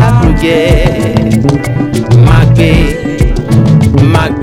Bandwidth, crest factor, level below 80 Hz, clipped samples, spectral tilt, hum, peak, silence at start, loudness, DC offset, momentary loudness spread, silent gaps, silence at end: 13 kHz; 6 dB; -16 dBFS; 7%; -7.5 dB/octave; none; 0 dBFS; 0 s; -8 LUFS; under 0.1%; 7 LU; none; 0 s